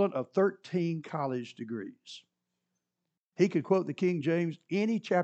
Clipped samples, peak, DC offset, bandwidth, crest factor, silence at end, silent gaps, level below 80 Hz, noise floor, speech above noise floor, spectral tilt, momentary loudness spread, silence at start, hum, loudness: under 0.1%; -12 dBFS; under 0.1%; 8.4 kHz; 20 dB; 0 s; 3.18-3.32 s; -90 dBFS; -87 dBFS; 56 dB; -7.5 dB/octave; 16 LU; 0 s; 60 Hz at -60 dBFS; -31 LUFS